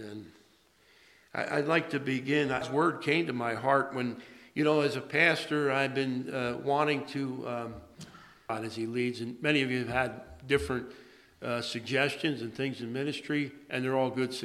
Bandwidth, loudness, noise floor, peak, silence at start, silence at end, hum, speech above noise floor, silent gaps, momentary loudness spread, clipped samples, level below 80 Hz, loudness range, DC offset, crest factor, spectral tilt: 14 kHz; -30 LUFS; -64 dBFS; -10 dBFS; 0 s; 0 s; none; 34 dB; none; 12 LU; under 0.1%; -60 dBFS; 5 LU; under 0.1%; 22 dB; -5.5 dB/octave